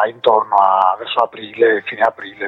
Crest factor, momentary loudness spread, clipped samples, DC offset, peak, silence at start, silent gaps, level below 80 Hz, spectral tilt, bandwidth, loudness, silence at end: 16 dB; 6 LU; under 0.1%; under 0.1%; 0 dBFS; 0 s; none; -64 dBFS; -5.5 dB/octave; 5.8 kHz; -15 LUFS; 0 s